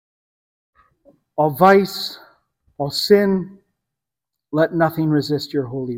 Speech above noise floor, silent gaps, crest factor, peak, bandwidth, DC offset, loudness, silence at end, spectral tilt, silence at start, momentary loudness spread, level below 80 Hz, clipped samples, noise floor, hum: 67 dB; none; 20 dB; 0 dBFS; 16.5 kHz; under 0.1%; -18 LUFS; 0 s; -6 dB/octave; 1.35 s; 14 LU; -58 dBFS; under 0.1%; -84 dBFS; none